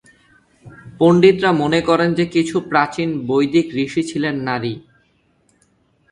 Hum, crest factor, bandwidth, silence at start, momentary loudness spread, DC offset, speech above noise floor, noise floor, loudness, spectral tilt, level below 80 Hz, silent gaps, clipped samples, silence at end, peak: none; 18 dB; 11 kHz; 0.65 s; 10 LU; under 0.1%; 44 dB; -60 dBFS; -17 LUFS; -6.5 dB/octave; -54 dBFS; none; under 0.1%; 1.3 s; 0 dBFS